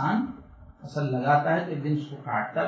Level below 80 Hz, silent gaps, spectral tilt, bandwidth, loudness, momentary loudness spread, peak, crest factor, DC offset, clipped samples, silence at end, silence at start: -58 dBFS; none; -8 dB/octave; 7.8 kHz; -27 LUFS; 13 LU; -10 dBFS; 18 dB; under 0.1%; under 0.1%; 0 s; 0 s